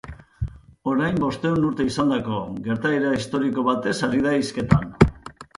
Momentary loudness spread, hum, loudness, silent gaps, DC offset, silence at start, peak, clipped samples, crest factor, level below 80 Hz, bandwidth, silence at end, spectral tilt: 13 LU; none; -22 LUFS; none; under 0.1%; 0.05 s; 0 dBFS; under 0.1%; 22 dB; -38 dBFS; 11.5 kHz; 0.15 s; -6.5 dB/octave